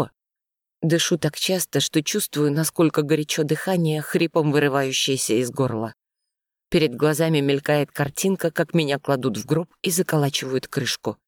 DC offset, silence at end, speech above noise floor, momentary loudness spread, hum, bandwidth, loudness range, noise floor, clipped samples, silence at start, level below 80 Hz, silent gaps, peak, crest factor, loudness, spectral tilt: under 0.1%; 0.15 s; 66 dB; 5 LU; none; 19 kHz; 2 LU; -87 dBFS; under 0.1%; 0 s; -58 dBFS; none; -6 dBFS; 16 dB; -22 LUFS; -4.5 dB/octave